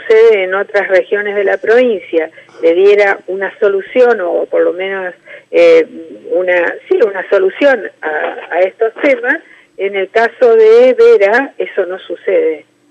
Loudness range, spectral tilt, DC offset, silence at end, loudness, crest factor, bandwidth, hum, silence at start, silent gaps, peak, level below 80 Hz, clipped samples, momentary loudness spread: 3 LU; -4.5 dB/octave; under 0.1%; 0.3 s; -11 LUFS; 10 dB; 8 kHz; none; 0 s; none; 0 dBFS; -64 dBFS; under 0.1%; 11 LU